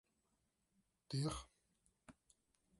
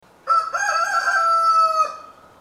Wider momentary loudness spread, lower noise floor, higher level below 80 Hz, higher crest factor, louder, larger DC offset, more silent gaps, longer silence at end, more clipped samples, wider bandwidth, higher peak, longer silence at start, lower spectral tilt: first, 24 LU vs 6 LU; first, -85 dBFS vs -40 dBFS; about the same, -66 dBFS vs -68 dBFS; first, 20 dB vs 12 dB; second, -45 LUFS vs -18 LUFS; neither; neither; first, 0.7 s vs 0.3 s; neither; second, 11.5 kHz vs 13.5 kHz; second, -32 dBFS vs -8 dBFS; first, 1.1 s vs 0.25 s; first, -5.5 dB/octave vs 1 dB/octave